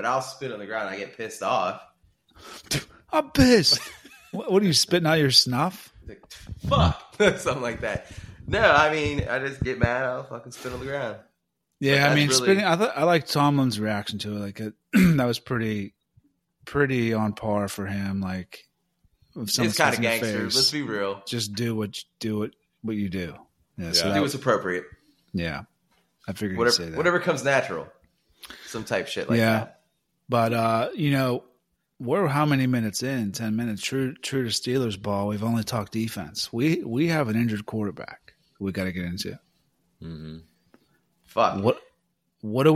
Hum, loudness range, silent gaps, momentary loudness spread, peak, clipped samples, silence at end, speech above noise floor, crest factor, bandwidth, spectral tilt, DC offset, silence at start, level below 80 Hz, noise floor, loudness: none; 6 LU; none; 17 LU; -2 dBFS; under 0.1%; 0 s; 53 dB; 22 dB; 16 kHz; -4.5 dB/octave; under 0.1%; 0 s; -48 dBFS; -77 dBFS; -24 LUFS